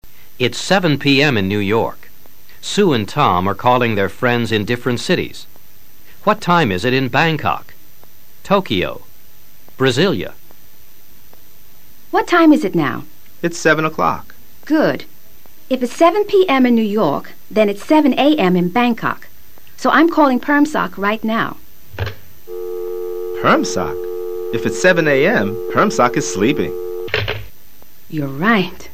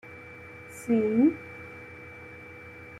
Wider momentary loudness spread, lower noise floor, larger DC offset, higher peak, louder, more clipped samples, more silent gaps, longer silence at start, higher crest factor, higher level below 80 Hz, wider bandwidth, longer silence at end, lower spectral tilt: second, 12 LU vs 21 LU; about the same, -47 dBFS vs -46 dBFS; first, 4% vs under 0.1%; first, 0 dBFS vs -12 dBFS; first, -16 LUFS vs -25 LUFS; neither; neither; about the same, 0 s vs 0.05 s; about the same, 16 dB vs 18 dB; first, -48 dBFS vs -68 dBFS; first, 15.5 kHz vs 13.5 kHz; about the same, 0.05 s vs 0 s; second, -5.5 dB/octave vs -7 dB/octave